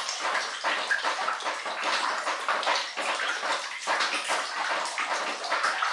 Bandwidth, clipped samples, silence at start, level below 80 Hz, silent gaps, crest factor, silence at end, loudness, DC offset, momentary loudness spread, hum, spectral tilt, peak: 11.5 kHz; under 0.1%; 0 s; under -90 dBFS; none; 18 dB; 0 s; -28 LUFS; under 0.1%; 3 LU; none; 1.5 dB/octave; -12 dBFS